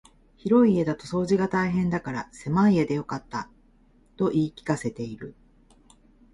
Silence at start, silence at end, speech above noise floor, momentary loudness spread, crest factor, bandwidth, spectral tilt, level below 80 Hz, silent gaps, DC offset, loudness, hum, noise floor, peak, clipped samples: 0.45 s; 1 s; 34 dB; 15 LU; 18 dB; 11.5 kHz; -7.5 dB/octave; -54 dBFS; none; under 0.1%; -25 LUFS; none; -59 dBFS; -8 dBFS; under 0.1%